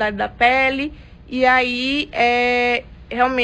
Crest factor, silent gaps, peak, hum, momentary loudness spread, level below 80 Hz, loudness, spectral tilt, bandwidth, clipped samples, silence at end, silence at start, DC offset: 14 dB; none; -4 dBFS; none; 11 LU; -42 dBFS; -17 LUFS; -4.5 dB/octave; 9.4 kHz; under 0.1%; 0 s; 0 s; under 0.1%